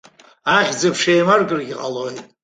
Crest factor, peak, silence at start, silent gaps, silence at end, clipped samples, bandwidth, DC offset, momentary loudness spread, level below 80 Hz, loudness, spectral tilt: 18 dB; -2 dBFS; 0.45 s; none; 0.2 s; under 0.1%; 9.6 kHz; under 0.1%; 12 LU; -60 dBFS; -17 LUFS; -4 dB/octave